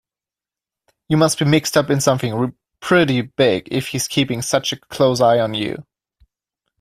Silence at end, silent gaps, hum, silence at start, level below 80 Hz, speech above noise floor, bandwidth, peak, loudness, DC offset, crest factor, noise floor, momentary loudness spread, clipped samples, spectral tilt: 1 s; none; none; 1.1 s; -54 dBFS; 73 dB; 16 kHz; -2 dBFS; -18 LUFS; under 0.1%; 18 dB; -90 dBFS; 9 LU; under 0.1%; -4.5 dB/octave